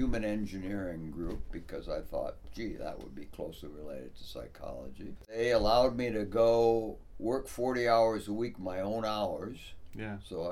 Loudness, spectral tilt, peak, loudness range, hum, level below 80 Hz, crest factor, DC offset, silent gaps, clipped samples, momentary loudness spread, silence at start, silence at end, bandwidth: -33 LUFS; -6 dB/octave; -14 dBFS; 13 LU; none; -46 dBFS; 18 dB; under 0.1%; none; under 0.1%; 19 LU; 0 s; 0 s; 15.5 kHz